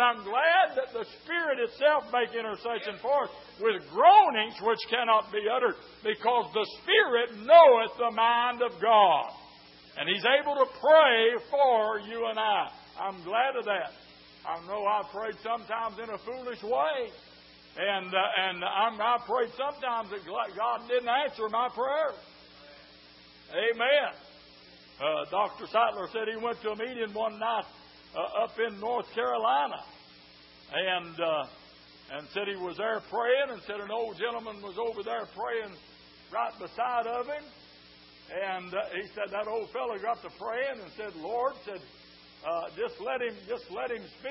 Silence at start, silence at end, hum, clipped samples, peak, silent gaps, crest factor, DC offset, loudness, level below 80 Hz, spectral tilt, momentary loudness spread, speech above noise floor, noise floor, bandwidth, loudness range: 0 s; 0 s; none; under 0.1%; -4 dBFS; none; 24 dB; under 0.1%; -28 LUFS; -70 dBFS; -7 dB/octave; 15 LU; 26 dB; -54 dBFS; 5.8 kHz; 12 LU